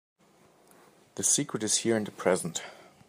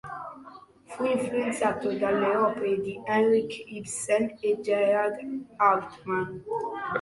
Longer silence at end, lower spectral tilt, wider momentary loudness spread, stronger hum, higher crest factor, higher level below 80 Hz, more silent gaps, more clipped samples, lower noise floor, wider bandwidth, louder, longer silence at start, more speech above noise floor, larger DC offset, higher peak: first, 0.25 s vs 0 s; second, -2.5 dB/octave vs -4.5 dB/octave; about the same, 14 LU vs 13 LU; neither; about the same, 22 dB vs 18 dB; second, -76 dBFS vs -66 dBFS; neither; neither; first, -62 dBFS vs -49 dBFS; first, 15.5 kHz vs 11.5 kHz; about the same, -28 LUFS vs -27 LUFS; first, 1.15 s vs 0.05 s; first, 33 dB vs 23 dB; neither; about the same, -8 dBFS vs -10 dBFS